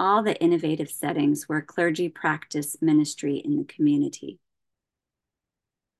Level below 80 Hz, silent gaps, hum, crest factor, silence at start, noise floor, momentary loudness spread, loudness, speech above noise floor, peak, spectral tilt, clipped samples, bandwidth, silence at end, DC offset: -74 dBFS; none; none; 18 dB; 0 s; -88 dBFS; 7 LU; -25 LUFS; 63 dB; -8 dBFS; -5.5 dB/octave; under 0.1%; 12.5 kHz; 1.65 s; under 0.1%